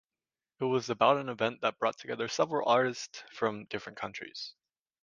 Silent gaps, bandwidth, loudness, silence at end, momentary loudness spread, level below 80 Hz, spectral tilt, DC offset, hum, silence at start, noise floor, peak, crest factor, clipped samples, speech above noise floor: none; 9.8 kHz; -31 LUFS; 0.5 s; 14 LU; -76 dBFS; -4.5 dB/octave; under 0.1%; none; 0.6 s; under -90 dBFS; -12 dBFS; 20 dB; under 0.1%; over 59 dB